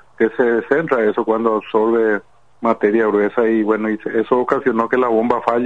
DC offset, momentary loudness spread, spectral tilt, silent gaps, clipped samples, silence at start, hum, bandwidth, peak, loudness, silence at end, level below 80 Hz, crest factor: 0.4%; 4 LU; -8 dB/octave; none; under 0.1%; 0.2 s; none; 6.8 kHz; -2 dBFS; -17 LUFS; 0 s; -60 dBFS; 16 dB